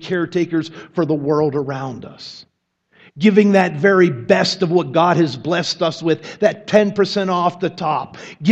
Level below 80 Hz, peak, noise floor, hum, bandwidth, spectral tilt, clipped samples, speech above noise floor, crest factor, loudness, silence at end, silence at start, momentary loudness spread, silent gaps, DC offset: -62 dBFS; 0 dBFS; -59 dBFS; none; 8.4 kHz; -6 dB/octave; under 0.1%; 42 dB; 18 dB; -17 LUFS; 0 s; 0 s; 12 LU; none; under 0.1%